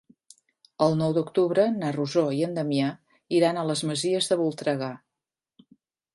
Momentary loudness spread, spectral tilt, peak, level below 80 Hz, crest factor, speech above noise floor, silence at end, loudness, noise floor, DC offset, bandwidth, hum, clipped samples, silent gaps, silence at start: 6 LU; -5.5 dB/octave; -8 dBFS; -72 dBFS; 20 dB; 64 dB; 1.2 s; -25 LUFS; -88 dBFS; under 0.1%; 11.5 kHz; none; under 0.1%; none; 0.8 s